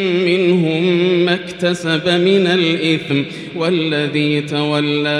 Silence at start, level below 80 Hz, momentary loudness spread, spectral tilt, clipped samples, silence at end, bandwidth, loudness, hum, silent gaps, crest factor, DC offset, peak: 0 s; -58 dBFS; 6 LU; -6 dB/octave; under 0.1%; 0 s; 11 kHz; -16 LUFS; none; none; 14 dB; under 0.1%; -2 dBFS